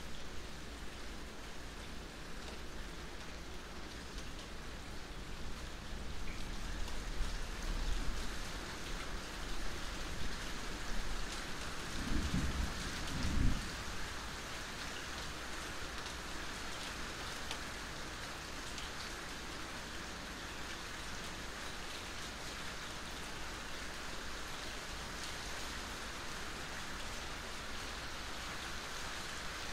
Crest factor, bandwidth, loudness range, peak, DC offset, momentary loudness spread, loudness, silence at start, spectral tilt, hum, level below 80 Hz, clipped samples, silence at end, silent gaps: 22 dB; 16 kHz; 8 LU; -20 dBFS; under 0.1%; 7 LU; -44 LUFS; 0 s; -3 dB/octave; none; -46 dBFS; under 0.1%; 0 s; none